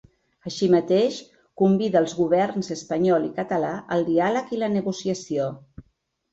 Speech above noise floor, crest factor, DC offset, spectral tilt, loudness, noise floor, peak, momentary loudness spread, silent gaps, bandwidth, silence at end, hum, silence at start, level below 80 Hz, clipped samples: 47 dB; 16 dB; under 0.1%; -6 dB/octave; -23 LUFS; -69 dBFS; -8 dBFS; 9 LU; none; 8 kHz; 0.5 s; none; 0.45 s; -62 dBFS; under 0.1%